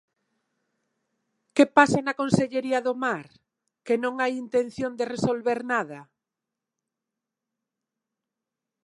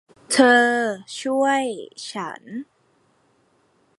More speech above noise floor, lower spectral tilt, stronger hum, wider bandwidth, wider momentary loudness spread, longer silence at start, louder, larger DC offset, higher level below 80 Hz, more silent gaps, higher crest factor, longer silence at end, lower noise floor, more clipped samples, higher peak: first, 63 dB vs 42 dB; first, -5.5 dB/octave vs -2.5 dB/octave; neither; about the same, 11.5 kHz vs 11.5 kHz; second, 10 LU vs 19 LU; first, 1.55 s vs 0.3 s; second, -25 LUFS vs -20 LUFS; neither; first, -64 dBFS vs -76 dBFS; neither; about the same, 24 dB vs 22 dB; first, 2.8 s vs 1.35 s; first, -87 dBFS vs -63 dBFS; neither; about the same, -2 dBFS vs -2 dBFS